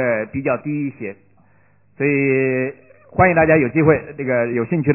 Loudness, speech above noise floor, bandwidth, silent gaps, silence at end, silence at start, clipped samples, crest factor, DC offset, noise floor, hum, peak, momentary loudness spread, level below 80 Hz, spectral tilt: -18 LUFS; 39 dB; 2.9 kHz; none; 0 s; 0 s; under 0.1%; 16 dB; 0.1%; -57 dBFS; none; -2 dBFS; 13 LU; -44 dBFS; -13.5 dB/octave